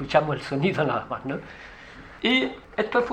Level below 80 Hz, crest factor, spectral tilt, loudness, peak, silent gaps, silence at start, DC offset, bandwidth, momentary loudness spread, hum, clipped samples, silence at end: -52 dBFS; 20 dB; -6 dB/octave; -25 LUFS; -6 dBFS; none; 0 s; under 0.1%; 9.6 kHz; 20 LU; none; under 0.1%; 0 s